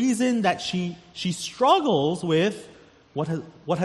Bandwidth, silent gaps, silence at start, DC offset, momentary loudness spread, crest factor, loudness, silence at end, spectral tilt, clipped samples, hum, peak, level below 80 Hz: 12.5 kHz; none; 0 s; under 0.1%; 12 LU; 18 dB; -24 LUFS; 0 s; -5 dB/octave; under 0.1%; none; -6 dBFS; -64 dBFS